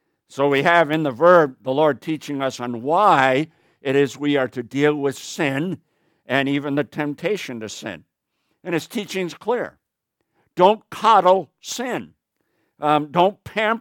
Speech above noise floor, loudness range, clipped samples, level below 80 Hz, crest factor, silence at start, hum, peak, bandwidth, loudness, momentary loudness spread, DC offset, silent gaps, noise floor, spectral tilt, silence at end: 57 dB; 8 LU; under 0.1%; -68 dBFS; 20 dB; 0.35 s; none; -2 dBFS; 18 kHz; -20 LUFS; 15 LU; under 0.1%; none; -77 dBFS; -5 dB/octave; 0 s